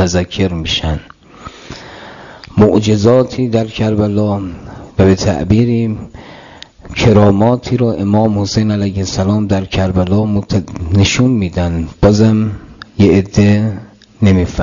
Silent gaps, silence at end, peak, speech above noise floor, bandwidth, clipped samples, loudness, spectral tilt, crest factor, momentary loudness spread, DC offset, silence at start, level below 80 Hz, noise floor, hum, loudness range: none; 0 s; 0 dBFS; 24 dB; 7.4 kHz; under 0.1%; -13 LUFS; -6.5 dB/octave; 12 dB; 19 LU; under 0.1%; 0 s; -34 dBFS; -36 dBFS; none; 2 LU